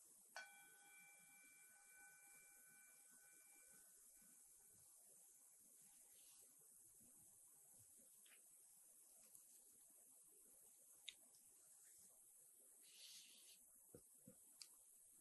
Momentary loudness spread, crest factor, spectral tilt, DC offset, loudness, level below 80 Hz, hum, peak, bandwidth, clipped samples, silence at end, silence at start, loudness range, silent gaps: 6 LU; 32 dB; 0 dB/octave; under 0.1%; -65 LUFS; under -90 dBFS; none; -36 dBFS; 12 kHz; under 0.1%; 0 s; 0 s; 3 LU; none